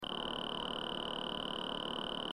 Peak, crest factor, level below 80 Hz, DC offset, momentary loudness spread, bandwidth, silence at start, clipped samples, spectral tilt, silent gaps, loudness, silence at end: -24 dBFS; 16 dB; -62 dBFS; 0.1%; 0 LU; 15.5 kHz; 0 s; under 0.1%; -4 dB/octave; none; -39 LUFS; 0 s